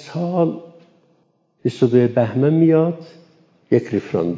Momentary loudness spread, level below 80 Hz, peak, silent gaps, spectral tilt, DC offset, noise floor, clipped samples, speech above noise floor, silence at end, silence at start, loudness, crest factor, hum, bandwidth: 11 LU; -60 dBFS; -2 dBFS; none; -9 dB/octave; under 0.1%; -62 dBFS; under 0.1%; 45 dB; 0 s; 0 s; -18 LUFS; 18 dB; none; 7.8 kHz